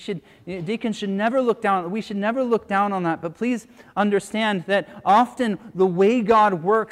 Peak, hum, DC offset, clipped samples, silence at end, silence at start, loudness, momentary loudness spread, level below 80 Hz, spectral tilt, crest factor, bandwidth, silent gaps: -4 dBFS; none; under 0.1%; under 0.1%; 0.05 s; 0 s; -21 LUFS; 11 LU; -62 dBFS; -6 dB/octave; 16 dB; 12.5 kHz; none